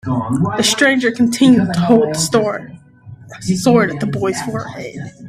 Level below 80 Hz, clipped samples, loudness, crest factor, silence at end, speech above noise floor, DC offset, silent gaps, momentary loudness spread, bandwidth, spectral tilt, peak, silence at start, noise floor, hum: -48 dBFS; under 0.1%; -15 LUFS; 16 dB; 0 s; 23 dB; under 0.1%; none; 15 LU; 15.5 kHz; -4.5 dB/octave; 0 dBFS; 0.05 s; -38 dBFS; none